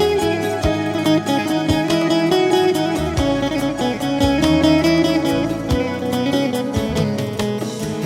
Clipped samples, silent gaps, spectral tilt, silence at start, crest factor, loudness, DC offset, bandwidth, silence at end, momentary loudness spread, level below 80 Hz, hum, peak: under 0.1%; none; -5.5 dB/octave; 0 s; 16 dB; -18 LUFS; under 0.1%; 16.5 kHz; 0 s; 6 LU; -34 dBFS; none; -2 dBFS